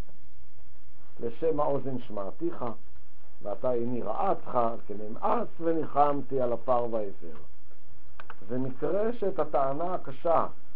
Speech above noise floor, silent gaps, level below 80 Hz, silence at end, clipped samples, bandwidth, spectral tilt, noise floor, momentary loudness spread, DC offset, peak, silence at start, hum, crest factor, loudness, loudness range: 29 dB; none; -62 dBFS; 0.2 s; under 0.1%; 5.2 kHz; -7.5 dB/octave; -59 dBFS; 12 LU; 7%; -10 dBFS; 1.2 s; none; 20 dB; -31 LUFS; 4 LU